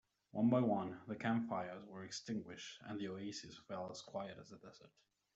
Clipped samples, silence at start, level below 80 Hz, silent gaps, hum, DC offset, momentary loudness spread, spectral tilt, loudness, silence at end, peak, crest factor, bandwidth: under 0.1%; 0.35 s; -80 dBFS; none; none; under 0.1%; 16 LU; -6 dB/octave; -42 LUFS; 0.45 s; -22 dBFS; 20 dB; 8 kHz